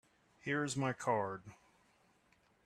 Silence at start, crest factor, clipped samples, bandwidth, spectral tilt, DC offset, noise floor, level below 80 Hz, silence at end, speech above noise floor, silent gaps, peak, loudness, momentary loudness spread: 0.45 s; 22 dB; under 0.1%; 13 kHz; -5 dB/octave; under 0.1%; -72 dBFS; -76 dBFS; 1.1 s; 35 dB; none; -20 dBFS; -38 LUFS; 11 LU